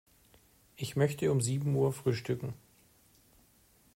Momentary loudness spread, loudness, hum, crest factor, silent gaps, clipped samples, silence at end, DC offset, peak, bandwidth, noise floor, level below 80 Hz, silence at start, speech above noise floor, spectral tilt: 12 LU; -32 LUFS; none; 20 dB; none; under 0.1%; 1.4 s; under 0.1%; -16 dBFS; 16 kHz; -65 dBFS; -66 dBFS; 0.8 s; 35 dB; -6 dB/octave